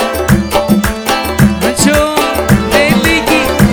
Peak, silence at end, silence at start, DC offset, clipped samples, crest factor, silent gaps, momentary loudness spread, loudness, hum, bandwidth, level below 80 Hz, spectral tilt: 0 dBFS; 0 s; 0 s; under 0.1%; 1%; 10 dB; none; 3 LU; -10 LUFS; none; over 20 kHz; -24 dBFS; -4.5 dB/octave